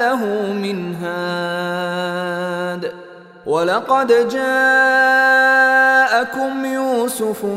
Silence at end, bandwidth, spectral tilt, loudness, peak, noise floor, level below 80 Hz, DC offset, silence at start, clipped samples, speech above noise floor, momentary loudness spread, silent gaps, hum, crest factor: 0 s; 16 kHz; -4 dB/octave; -16 LUFS; -2 dBFS; -38 dBFS; -64 dBFS; under 0.1%; 0 s; under 0.1%; 22 dB; 12 LU; none; none; 14 dB